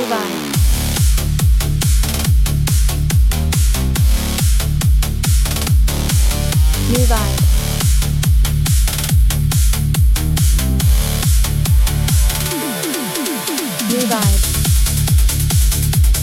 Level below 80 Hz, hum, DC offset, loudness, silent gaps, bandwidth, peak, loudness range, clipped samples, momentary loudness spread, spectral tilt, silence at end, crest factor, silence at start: -16 dBFS; none; under 0.1%; -16 LUFS; none; 16.5 kHz; -2 dBFS; 1 LU; under 0.1%; 3 LU; -4.5 dB/octave; 0 s; 12 dB; 0 s